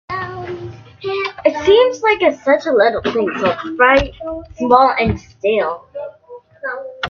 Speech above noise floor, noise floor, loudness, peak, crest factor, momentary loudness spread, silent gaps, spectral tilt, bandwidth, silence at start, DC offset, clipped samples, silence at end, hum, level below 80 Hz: 26 dB; -40 dBFS; -15 LUFS; 0 dBFS; 16 dB; 16 LU; none; -5.5 dB/octave; 7 kHz; 0.1 s; under 0.1%; under 0.1%; 0 s; none; -40 dBFS